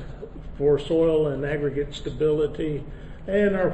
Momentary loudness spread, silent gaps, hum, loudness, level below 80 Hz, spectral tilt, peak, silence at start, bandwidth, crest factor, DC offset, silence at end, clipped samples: 18 LU; none; none; -24 LUFS; -40 dBFS; -7.5 dB/octave; -10 dBFS; 0 s; 8.6 kHz; 14 dB; under 0.1%; 0 s; under 0.1%